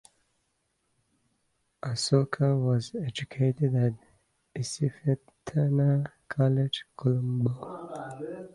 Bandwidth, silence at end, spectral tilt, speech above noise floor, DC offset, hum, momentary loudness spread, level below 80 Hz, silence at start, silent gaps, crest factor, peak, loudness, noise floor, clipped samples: 11.5 kHz; 0.05 s; -6.5 dB/octave; 48 dB; under 0.1%; none; 14 LU; -64 dBFS; 1.85 s; none; 20 dB; -10 dBFS; -28 LUFS; -76 dBFS; under 0.1%